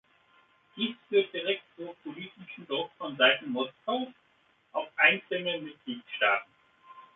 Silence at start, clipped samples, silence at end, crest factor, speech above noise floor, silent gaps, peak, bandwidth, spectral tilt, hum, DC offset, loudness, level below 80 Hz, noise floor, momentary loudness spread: 0.75 s; under 0.1%; 0.15 s; 24 dB; 37 dB; none; -6 dBFS; 4 kHz; -7 dB/octave; none; under 0.1%; -29 LUFS; -82 dBFS; -68 dBFS; 19 LU